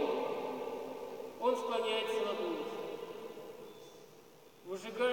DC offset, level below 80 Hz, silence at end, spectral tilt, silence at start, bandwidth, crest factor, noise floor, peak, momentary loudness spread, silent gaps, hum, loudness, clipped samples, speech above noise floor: under 0.1%; -84 dBFS; 0 s; -3.5 dB/octave; 0 s; 17 kHz; 16 dB; -59 dBFS; -22 dBFS; 20 LU; none; none; -38 LUFS; under 0.1%; 24 dB